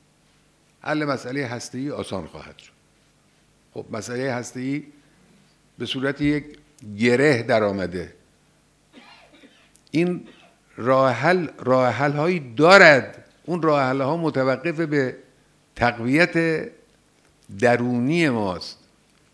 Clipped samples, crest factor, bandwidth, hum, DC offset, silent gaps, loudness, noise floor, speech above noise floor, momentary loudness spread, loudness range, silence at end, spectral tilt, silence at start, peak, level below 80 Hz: under 0.1%; 22 dB; 11 kHz; none; under 0.1%; none; -21 LUFS; -60 dBFS; 39 dB; 16 LU; 14 LU; 0.6 s; -5.5 dB/octave; 0.85 s; 0 dBFS; -58 dBFS